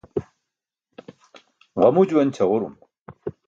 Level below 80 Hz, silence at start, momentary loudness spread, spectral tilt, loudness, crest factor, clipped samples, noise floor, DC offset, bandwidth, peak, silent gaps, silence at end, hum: -60 dBFS; 0.15 s; 18 LU; -8 dB/octave; -20 LUFS; 20 dB; under 0.1%; -85 dBFS; under 0.1%; 7.6 kHz; -4 dBFS; 3.01-3.06 s; 0.2 s; none